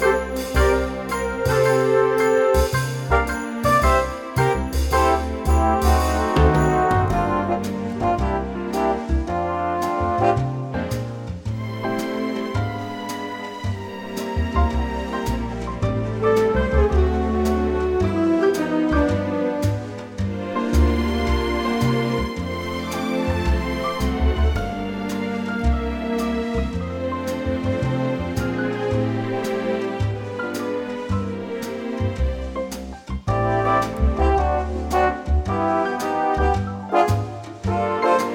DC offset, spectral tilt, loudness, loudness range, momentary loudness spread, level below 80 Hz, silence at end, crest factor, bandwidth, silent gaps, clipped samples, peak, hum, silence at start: under 0.1%; -6.5 dB/octave; -22 LUFS; 6 LU; 9 LU; -28 dBFS; 0 s; 18 dB; 18.5 kHz; none; under 0.1%; -4 dBFS; none; 0 s